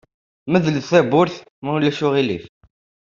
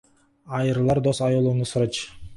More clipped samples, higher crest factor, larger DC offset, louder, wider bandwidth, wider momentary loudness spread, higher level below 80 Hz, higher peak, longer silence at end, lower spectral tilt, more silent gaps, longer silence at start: neither; about the same, 18 dB vs 14 dB; neither; first, -18 LUFS vs -23 LUFS; second, 7.4 kHz vs 11.5 kHz; first, 13 LU vs 7 LU; second, -58 dBFS vs -50 dBFS; first, -2 dBFS vs -10 dBFS; first, 0.7 s vs 0 s; about the same, -6.5 dB/octave vs -6.5 dB/octave; first, 1.50-1.62 s vs none; about the same, 0.45 s vs 0.45 s